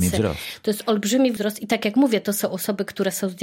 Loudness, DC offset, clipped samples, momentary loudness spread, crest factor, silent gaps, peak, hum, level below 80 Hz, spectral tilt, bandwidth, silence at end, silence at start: -22 LUFS; under 0.1%; under 0.1%; 7 LU; 16 dB; none; -6 dBFS; none; -48 dBFS; -4.5 dB/octave; 17 kHz; 0 s; 0 s